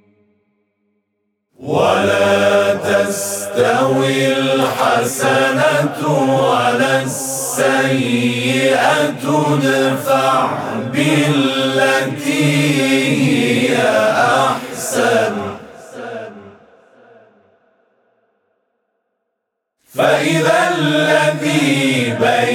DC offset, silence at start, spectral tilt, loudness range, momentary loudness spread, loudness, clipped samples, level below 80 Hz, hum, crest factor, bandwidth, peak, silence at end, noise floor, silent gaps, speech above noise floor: under 0.1%; 1.6 s; -4.5 dB/octave; 6 LU; 7 LU; -14 LUFS; under 0.1%; -64 dBFS; none; 14 dB; 19 kHz; -2 dBFS; 0 s; -75 dBFS; none; 61 dB